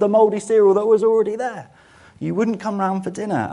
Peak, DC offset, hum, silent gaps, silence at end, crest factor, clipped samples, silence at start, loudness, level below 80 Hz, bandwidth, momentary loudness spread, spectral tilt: -4 dBFS; under 0.1%; none; none; 0 s; 14 dB; under 0.1%; 0 s; -19 LUFS; -64 dBFS; 11 kHz; 12 LU; -7 dB/octave